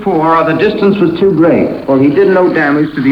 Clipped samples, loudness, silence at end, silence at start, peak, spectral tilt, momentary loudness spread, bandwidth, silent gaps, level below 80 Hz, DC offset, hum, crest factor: under 0.1%; -10 LUFS; 0 s; 0 s; 0 dBFS; -8.5 dB/octave; 3 LU; 5.8 kHz; none; -44 dBFS; under 0.1%; none; 8 dB